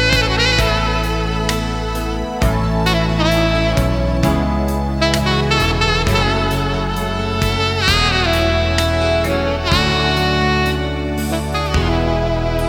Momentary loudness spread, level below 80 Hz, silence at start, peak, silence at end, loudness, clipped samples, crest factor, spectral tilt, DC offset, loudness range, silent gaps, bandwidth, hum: 6 LU; -24 dBFS; 0 s; 0 dBFS; 0 s; -16 LUFS; under 0.1%; 16 dB; -5 dB/octave; 0.3%; 2 LU; none; 18 kHz; none